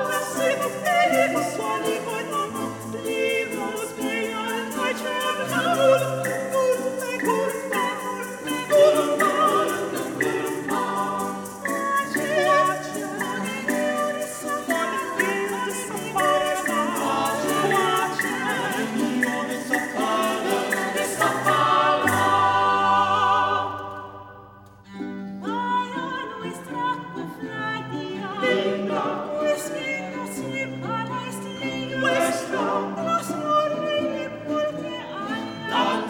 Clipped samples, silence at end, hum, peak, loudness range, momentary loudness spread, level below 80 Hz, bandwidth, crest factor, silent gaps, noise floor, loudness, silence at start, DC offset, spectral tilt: under 0.1%; 0 s; none; -4 dBFS; 6 LU; 11 LU; -64 dBFS; 19.5 kHz; 18 dB; none; -46 dBFS; -24 LUFS; 0 s; under 0.1%; -3.5 dB/octave